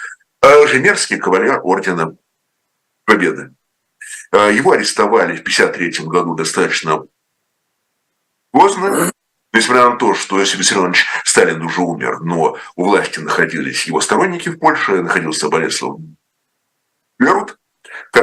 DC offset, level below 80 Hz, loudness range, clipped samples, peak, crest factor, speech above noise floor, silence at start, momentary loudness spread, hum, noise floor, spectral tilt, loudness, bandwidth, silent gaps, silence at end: under 0.1%; -56 dBFS; 4 LU; 0.1%; 0 dBFS; 16 dB; 56 dB; 0 s; 9 LU; none; -70 dBFS; -3 dB/octave; -14 LUFS; 13.5 kHz; none; 0 s